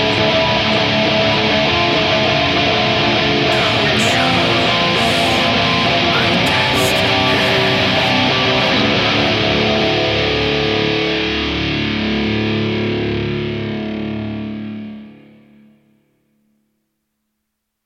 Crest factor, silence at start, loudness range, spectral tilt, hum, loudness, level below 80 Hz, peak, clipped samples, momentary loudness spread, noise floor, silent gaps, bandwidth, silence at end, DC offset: 14 dB; 0 s; 11 LU; -4.5 dB/octave; none; -14 LUFS; -38 dBFS; -2 dBFS; under 0.1%; 8 LU; -74 dBFS; none; 16 kHz; 2.7 s; under 0.1%